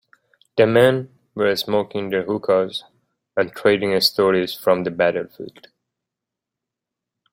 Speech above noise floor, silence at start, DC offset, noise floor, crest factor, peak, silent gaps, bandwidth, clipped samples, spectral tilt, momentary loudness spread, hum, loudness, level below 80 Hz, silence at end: 66 dB; 0.55 s; under 0.1%; -85 dBFS; 20 dB; -2 dBFS; none; 16.5 kHz; under 0.1%; -5 dB/octave; 12 LU; none; -19 LUFS; -62 dBFS; 1.85 s